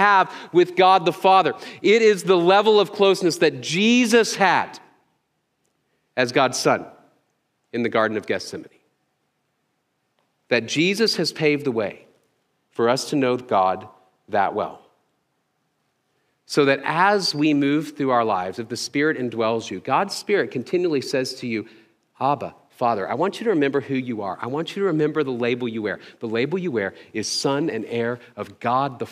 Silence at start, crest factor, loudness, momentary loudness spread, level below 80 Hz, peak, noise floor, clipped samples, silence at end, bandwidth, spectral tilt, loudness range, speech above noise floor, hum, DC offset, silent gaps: 0 s; 20 dB; -21 LUFS; 12 LU; -74 dBFS; -2 dBFS; -72 dBFS; under 0.1%; 0 s; 15.5 kHz; -4.5 dB/octave; 8 LU; 51 dB; none; under 0.1%; none